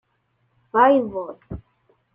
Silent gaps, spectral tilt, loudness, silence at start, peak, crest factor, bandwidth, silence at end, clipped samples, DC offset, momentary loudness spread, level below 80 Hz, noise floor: none; -9 dB/octave; -19 LUFS; 0.75 s; -4 dBFS; 20 dB; 3.6 kHz; 0.55 s; under 0.1%; under 0.1%; 22 LU; -52 dBFS; -69 dBFS